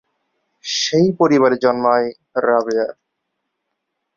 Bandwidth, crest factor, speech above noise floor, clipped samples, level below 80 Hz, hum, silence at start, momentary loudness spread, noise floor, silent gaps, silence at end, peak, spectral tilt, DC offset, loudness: 7.4 kHz; 16 dB; 60 dB; under 0.1%; -62 dBFS; none; 0.65 s; 9 LU; -75 dBFS; none; 1.25 s; -2 dBFS; -4.5 dB/octave; under 0.1%; -17 LUFS